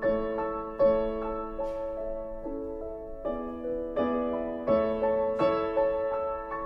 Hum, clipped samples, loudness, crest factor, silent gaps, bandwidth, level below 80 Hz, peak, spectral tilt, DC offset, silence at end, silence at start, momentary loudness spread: none; under 0.1%; -30 LUFS; 16 dB; none; 5.6 kHz; -46 dBFS; -14 dBFS; -8.5 dB/octave; under 0.1%; 0 s; 0 s; 11 LU